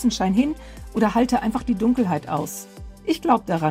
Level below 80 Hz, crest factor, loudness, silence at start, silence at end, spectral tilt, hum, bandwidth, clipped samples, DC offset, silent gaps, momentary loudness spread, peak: -42 dBFS; 18 dB; -22 LUFS; 0 s; 0 s; -6 dB/octave; none; 16 kHz; under 0.1%; under 0.1%; none; 12 LU; -4 dBFS